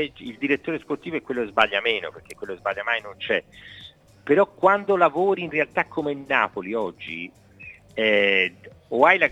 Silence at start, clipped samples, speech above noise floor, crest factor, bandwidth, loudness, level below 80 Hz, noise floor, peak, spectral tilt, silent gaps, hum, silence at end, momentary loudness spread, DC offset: 0 s; under 0.1%; 22 dB; 22 dB; 12 kHz; -23 LUFS; -62 dBFS; -46 dBFS; -2 dBFS; -5.5 dB/octave; none; none; 0 s; 20 LU; under 0.1%